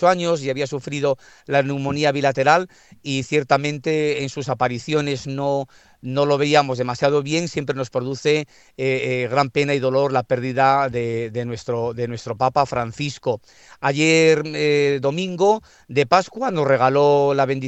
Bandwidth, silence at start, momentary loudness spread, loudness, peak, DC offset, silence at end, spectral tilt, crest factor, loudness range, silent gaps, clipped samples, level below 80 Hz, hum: 8.4 kHz; 0 s; 10 LU; -20 LUFS; 0 dBFS; under 0.1%; 0 s; -5.5 dB/octave; 20 dB; 3 LU; none; under 0.1%; -58 dBFS; none